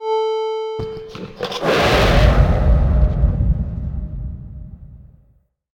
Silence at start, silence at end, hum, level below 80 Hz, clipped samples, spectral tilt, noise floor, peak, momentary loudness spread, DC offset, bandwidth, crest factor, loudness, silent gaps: 0 s; 0.75 s; none; -20 dBFS; under 0.1%; -6.5 dB/octave; -57 dBFS; 0 dBFS; 18 LU; under 0.1%; 16 kHz; 16 dB; -18 LUFS; none